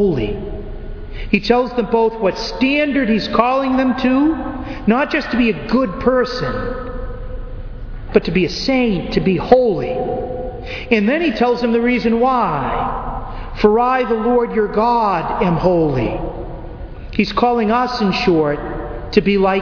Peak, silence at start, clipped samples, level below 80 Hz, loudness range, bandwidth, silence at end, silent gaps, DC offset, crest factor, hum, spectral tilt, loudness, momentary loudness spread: 0 dBFS; 0 s; under 0.1%; -32 dBFS; 3 LU; 5.4 kHz; 0 s; none; under 0.1%; 16 dB; none; -7 dB/octave; -17 LUFS; 15 LU